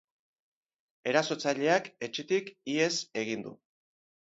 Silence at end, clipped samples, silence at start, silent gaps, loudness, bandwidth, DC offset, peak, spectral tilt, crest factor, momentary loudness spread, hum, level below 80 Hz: 0.75 s; under 0.1%; 1.05 s; none; -31 LUFS; 8 kHz; under 0.1%; -10 dBFS; -3.5 dB/octave; 24 dB; 10 LU; none; -80 dBFS